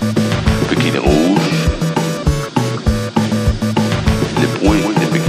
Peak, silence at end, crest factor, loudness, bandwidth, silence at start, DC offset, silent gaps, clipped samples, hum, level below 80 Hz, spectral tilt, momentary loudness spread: 0 dBFS; 0 s; 14 dB; -15 LUFS; 15.5 kHz; 0 s; under 0.1%; none; under 0.1%; none; -24 dBFS; -6 dB/octave; 4 LU